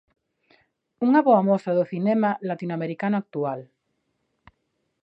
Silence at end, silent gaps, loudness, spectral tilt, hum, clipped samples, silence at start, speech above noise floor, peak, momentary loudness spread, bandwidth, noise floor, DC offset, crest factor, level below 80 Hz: 1.4 s; none; -23 LUFS; -9.5 dB/octave; none; under 0.1%; 1 s; 53 dB; -6 dBFS; 11 LU; 8 kHz; -75 dBFS; under 0.1%; 18 dB; -74 dBFS